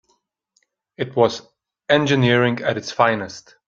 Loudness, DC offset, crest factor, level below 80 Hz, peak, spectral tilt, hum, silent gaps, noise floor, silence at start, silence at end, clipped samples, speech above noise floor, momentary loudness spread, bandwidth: -19 LUFS; under 0.1%; 20 dB; -58 dBFS; 0 dBFS; -5.5 dB/octave; none; none; -68 dBFS; 1 s; 0.25 s; under 0.1%; 49 dB; 16 LU; 7.6 kHz